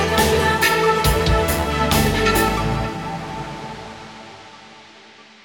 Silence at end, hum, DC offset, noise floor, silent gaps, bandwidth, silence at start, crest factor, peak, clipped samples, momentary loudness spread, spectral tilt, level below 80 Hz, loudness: 0.2 s; none; 0.2%; -45 dBFS; none; 19 kHz; 0 s; 16 dB; -4 dBFS; under 0.1%; 20 LU; -4.5 dB/octave; -30 dBFS; -18 LUFS